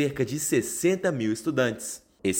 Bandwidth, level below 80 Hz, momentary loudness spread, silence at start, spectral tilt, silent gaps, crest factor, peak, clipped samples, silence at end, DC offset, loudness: 17 kHz; -60 dBFS; 7 LU; 0 s; -4.5 dB/octave; none; 16 dB; -10 dBFS; under 0.1%; 0 s; under 0.1%; -27 LUFS